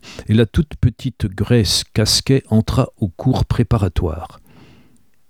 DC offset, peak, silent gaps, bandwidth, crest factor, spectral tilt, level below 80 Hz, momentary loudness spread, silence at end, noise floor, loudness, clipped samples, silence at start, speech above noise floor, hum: 0.3%; -2 dBFS; none; 16 kHz; 16 dB; -5.5 dB/octave; -30 dBFS; 9 LU; 1 s; -55 dBFS; -17 LUFS; under 0.1%; 0.05 s; 38 dB; none